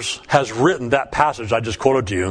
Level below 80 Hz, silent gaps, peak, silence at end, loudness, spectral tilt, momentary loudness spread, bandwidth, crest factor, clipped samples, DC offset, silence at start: -44 dBFS; none; 0 dBFS; 0 s; -19 LUFS; -5 dB/octave; 3 LU; 10.5 kHz; 18 dB; under 0.1%; under 0.1%; 0 s